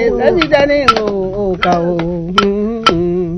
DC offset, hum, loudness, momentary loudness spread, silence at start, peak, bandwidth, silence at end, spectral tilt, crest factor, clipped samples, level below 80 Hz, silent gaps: under 0.1%; none; -13 LUFS; 7 LU; 0 s; 0 dBFS; 11 kHz; 0 s; -5.5 dB/octave; 12 dB; 0.5%; -32 dBFS; none